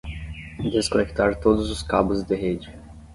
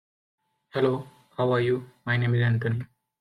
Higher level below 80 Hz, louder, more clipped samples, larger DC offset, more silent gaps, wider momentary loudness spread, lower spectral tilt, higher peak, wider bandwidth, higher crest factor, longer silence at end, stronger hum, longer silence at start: first, -38 dBFS vs -64 dBFS; first, -23 LUFS vs -26 LUFS; neither; neither; neither; first, 14 LU vs 11 LU; second, -5.5 dB/octave vs -8.5 dB/octave; first, -4 dBFS vs -10 dBFS; first, 11.5 kHz vs 4.8 kHz; about the same, 20 dB vs 16 dB; second, 0 s vs 0.35 s; neither; second, 0.05 s vs 0.75 s